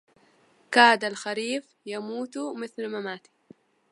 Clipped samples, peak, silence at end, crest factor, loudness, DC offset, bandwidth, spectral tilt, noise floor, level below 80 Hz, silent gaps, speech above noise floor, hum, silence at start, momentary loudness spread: under 0.1%; -2 dBFS; 0.75 s; 26 dB; -25 LUFS; under 0.1%; 11.5 kHz; -2.5 dB/octave; -62 dBFS; -84 dBFS; none; 36 dB; none; 0.7 s; 18 LU